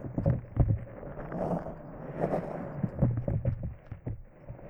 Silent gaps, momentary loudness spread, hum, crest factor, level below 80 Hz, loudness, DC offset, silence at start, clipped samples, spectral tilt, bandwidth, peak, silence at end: none; 13 LU; none; 20 dB; -42 dBFS; -33 LUFS; under 0.1%; 0 s; under 0.1%; -11.5 dB/octave; 3.2 kHz; -12 dBFS; 0 s